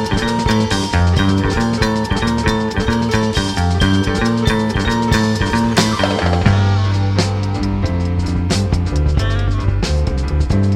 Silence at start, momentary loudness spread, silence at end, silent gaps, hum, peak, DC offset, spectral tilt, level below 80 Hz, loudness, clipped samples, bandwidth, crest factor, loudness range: 0 s; 4 LU; 0 s; none; none; 0 dBFS; under 0.1%; -6 dB/octave; -24 dBFS; -16 LUFS; under 0.1%; 13 kHz; 16 dB; 2 LU